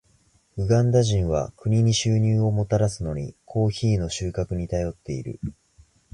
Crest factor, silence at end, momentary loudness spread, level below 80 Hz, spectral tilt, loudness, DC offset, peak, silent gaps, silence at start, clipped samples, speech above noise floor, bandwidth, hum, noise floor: 16 dB; 0.6 s; 13 LU; -40 dBFS; -6.5 dB/octave; -24 LUFS; under 0.1%; -8 dBFS; none; 0.55 s; under 0.1%; 39 dB; 11 kHz; none; -62 dBFS